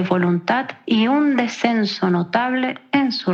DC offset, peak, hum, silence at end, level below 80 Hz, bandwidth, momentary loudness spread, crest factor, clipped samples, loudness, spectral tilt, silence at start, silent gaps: under 0.1%; -2 dBFS; none; 0 s; -78 dBFS; 7.6 kHz; 4 LU; 16 dB; under 0.1%; -19 LUFS; -6 dB/octave; 0 s; none